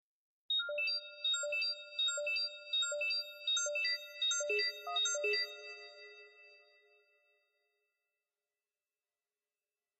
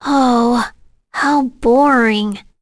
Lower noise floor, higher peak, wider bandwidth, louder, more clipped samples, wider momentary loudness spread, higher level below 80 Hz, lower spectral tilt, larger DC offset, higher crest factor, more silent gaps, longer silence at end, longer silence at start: first, under -90 dBFS vs -37 dBFS; second, -24 dBFS vs -4 dBFS; first, 13 kHz vs 11 kHz; second, -34 LUFS vs -14 LUFS; neither; about the same, 10 LU vs 12 LU; second, under -90 dBFS vs -42 dBFS; second, 4.5 dB/octave vs -5 dB/octave; neither; about the same, 16 dB vs 12 dB; neither; first, 3.45 s vs 0.2 s; first, 0.5 s vs 0 s